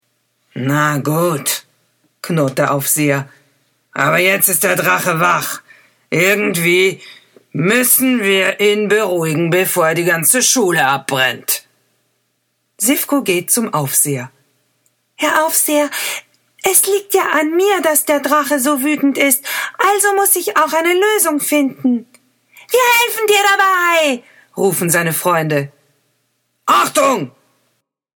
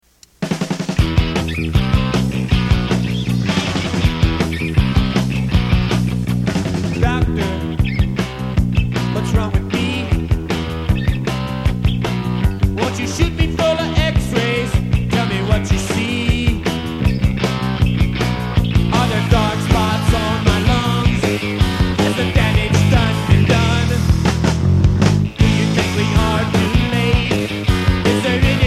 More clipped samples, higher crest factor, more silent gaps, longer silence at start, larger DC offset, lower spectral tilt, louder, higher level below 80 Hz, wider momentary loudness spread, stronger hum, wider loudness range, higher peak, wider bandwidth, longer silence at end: neither; about the same, 16 dB vs 16 dB; neither; first, 0.55 s vs 0.4 s; neither; second, -3 dB/octave vs -6 dB/octave; first, -14 LUFS vs -17 LUFS; second, -66 dBFS vs -24 dBFS; first, 9 LU vs 5 LU; neither; about the same, 4 LU vs 4 LU; about the same, 0 dBFS vs 0 dBFS; first, over 20 kHz vs 14.5 kHz; first, 0.9 s vs 0 s